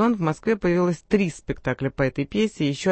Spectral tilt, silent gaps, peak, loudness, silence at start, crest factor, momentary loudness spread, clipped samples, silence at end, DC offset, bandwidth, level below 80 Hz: -6.5 dB/octave; none; -8 dBFS; -24 LUFS; 0 s; 16 dB; 5 LU; under 0.1%; 0 s; under 0.1%; 8.8 kHz; -46 dBFS